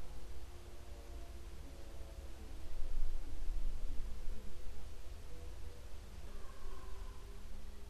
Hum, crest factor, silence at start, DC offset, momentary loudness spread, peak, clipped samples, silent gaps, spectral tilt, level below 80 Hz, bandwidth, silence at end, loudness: none; 16 dB; 0 s; 0.3%; 8 LU; -20 dBFS; under 0.1%; none; -5 dB/octave; -42 dBFS; 10.5 kHz; 0 s; -52 LUFS